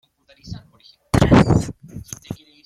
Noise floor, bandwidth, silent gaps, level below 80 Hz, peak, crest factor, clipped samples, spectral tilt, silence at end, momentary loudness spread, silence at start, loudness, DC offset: -52 dBFS; 14 kHz; none; -34 dBFS; -2 dBFS; 18 dB; under 0.1%; -6.5 dB/octave; 0.3 s; 24 LU; 0.45 s; -16 LUFS; under 0.1%